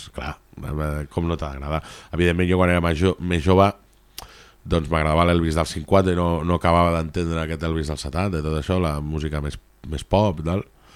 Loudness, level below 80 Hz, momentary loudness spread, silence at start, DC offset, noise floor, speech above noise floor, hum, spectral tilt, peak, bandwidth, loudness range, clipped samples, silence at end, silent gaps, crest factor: -22 LUFS; -34 dBFS; 15 LU; 0 s; under 0.1%; -43 dBFS; 22 dB; none; -6.5 dB/octave; -4 dBFS; 14.5 kHz; 4 LU; under 0.1%; 0.3 s; none; 18 dB